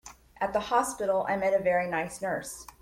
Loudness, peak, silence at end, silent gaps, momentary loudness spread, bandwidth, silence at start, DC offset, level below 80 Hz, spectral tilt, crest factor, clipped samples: -29 LUFS; -12 dBFS; 0.1 s; none; 8 LU; 16 kHz; 0.05 s; under 0.1%; -60 dBFS; -4 dB/octave; 16 dB; under 0.1%